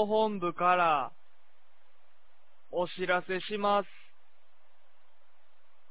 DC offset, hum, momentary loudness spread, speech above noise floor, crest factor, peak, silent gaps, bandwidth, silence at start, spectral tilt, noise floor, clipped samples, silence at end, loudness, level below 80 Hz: 0.8%; 50 Hz at -75 dBFS; 11 LU; 41 dB; 18 dB; -14 dBFS; none; 4 kHz; 0 s; -3 dB/octave; -70 dBFS; under 0.1%; 2.05 s; -30 LUFS; -78 dBFS